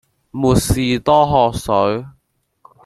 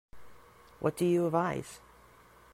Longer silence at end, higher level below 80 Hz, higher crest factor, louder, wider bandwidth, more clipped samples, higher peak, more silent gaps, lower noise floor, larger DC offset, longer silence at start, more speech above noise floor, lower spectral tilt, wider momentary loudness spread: about the same, 0.75 s vs 0.75 s; first, -34 dBFS vs -64 dBFS; about the same, 16 dB vs 18 dB; first, -16 LUFS vs -31 LUFS; about the same, 15 kHz vs 15.5 kHz; neither; first, 0 dBFS vs -14 dBFS; neither; first, -65 dBFS vs -58 dBFS; neither; first, 0.35 s vs 0.15 s; first, 50 dB vs 28 dB; second, -5.5 dB/octave vs -7 dB/octave; second, 8 LU vs 19 LU